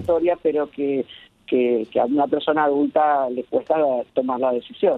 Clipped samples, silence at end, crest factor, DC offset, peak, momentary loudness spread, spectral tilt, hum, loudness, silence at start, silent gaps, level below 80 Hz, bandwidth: under 0.1%; 0 s; 14 dB; under 0.1%; -6 dBFS; 5 LU; -8 dB/octave; none; -21 LUFS; 0 s; none; -58 dBFS; 4.3 kHz